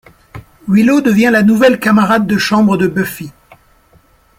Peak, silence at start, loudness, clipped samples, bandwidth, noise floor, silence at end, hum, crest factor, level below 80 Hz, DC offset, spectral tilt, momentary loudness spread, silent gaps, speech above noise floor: 0 dBFS; 0.35 s; -11 LUFS; under 0.1%; 16.5 kHz; -49 dBFS; 1.1 s; none; 12 dB; -48 dBFS; under 0.1%; -6 dB/octave; 12 LU; none; 39 dB